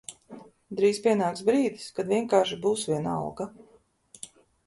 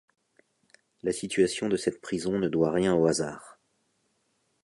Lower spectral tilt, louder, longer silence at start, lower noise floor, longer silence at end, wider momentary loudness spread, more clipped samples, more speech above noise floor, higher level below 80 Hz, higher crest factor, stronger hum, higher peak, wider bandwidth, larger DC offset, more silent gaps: about the same, -5 dB/octave vs -5 dB/octave; about the same, -26 LUFS vs -27 LUFS; second, 0.1 s vs 1.05 s; second, -57 dBFS vs -73 dBFS; second, 0.4 s vs 1.15 s; first, 20 LU vs 10 LU; neither; second, 31 dB vs 47 dB; second, -66 dBFS vs -60 dBFS; about the same, 20 dB vs 20 dB; neither; about the same, -8 dBFS vs -10 dBFS; about the same, 11.5 kHz vs 11.5 kHz; neither; neither